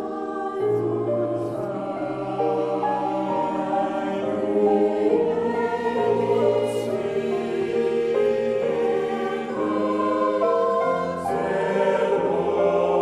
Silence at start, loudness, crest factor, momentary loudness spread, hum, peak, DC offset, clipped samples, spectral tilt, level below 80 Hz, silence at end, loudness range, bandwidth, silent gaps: 0 s; -23 LUFS; 14 dB; 6 LU; none; -8 dBFS; under 0.1%; under 0.1%; -7 dB/octave; -62 dBFS; 0 s; 3 LU; 12 kHz; none